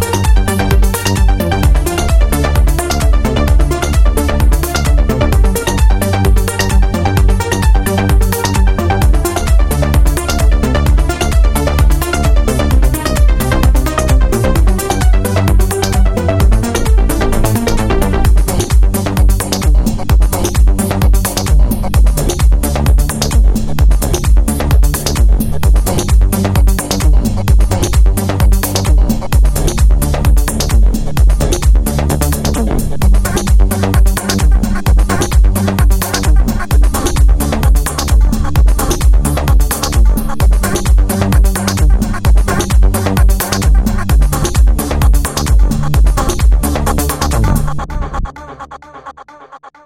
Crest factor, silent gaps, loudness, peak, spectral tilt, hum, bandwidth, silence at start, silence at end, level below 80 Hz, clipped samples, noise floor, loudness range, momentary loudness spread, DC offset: 10 dB; none; -13 LUFS; 0 dBFS; -5.5 dB/octave; none; 16.5 kHz; 0 s; 0.15 s; -10 dBFS; under 0.1%; -36 dBFS; 1 LU; 2 LU; under 0.1%